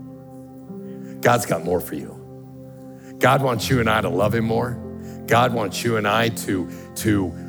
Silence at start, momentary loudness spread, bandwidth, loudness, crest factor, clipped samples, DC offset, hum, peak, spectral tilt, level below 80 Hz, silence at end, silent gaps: 0 s; 22 LU; over 20 kHz; -21 LUFS; 20 dB; under 0.1%; under 0.1%; none; -2 dBFS; -5 dB/octave; -56 dBFS; 0 s; none